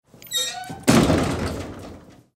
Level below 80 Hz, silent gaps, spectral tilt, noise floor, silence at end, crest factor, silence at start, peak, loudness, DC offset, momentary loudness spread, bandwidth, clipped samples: -40 dBFS; none; -4.5 dB/octave; -43 dBFS; 0.35 s; 22 dB; 0.25 s; -2 dBFS; -21 LUFS; under 0.1%; 19 LU; 16 kHz; under 0.1%